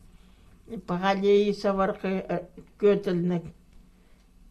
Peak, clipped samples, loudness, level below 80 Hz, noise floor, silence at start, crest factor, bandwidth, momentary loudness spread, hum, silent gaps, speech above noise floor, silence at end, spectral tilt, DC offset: -12 dBFS; under 0.1%; -26 LUFS; -54 dBFS; -56 dBFS; 0.7 s; 16 dB; 8.4 kHz; 19 LU; none; none; 31 dB; 1 s; -7.5 dB/octave; under 0.1%